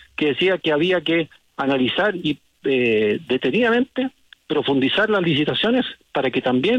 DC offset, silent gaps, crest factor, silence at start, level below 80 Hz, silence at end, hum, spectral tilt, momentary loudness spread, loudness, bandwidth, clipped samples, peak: under 0.1%; none; 12 dB; 0.2 s; -58 dBFS; 0 s; none; -6.5 dB/octave; 7 LU; -20 LUFS; 8.6 kHz; under 0.1%; -8 dBFS